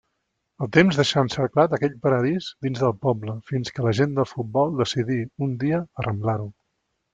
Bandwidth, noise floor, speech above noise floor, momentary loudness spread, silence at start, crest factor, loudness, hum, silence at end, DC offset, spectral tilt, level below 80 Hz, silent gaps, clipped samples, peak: 9.2 kHz; -76 dBFS; 54 dB; 10 LU; 0.6 s; 20 dB; -23 LUFS; none; 0.65 s; under 0.1%; -6.5 dB/octave; -56 dBFS; none; under 0.1%; -2 dBFS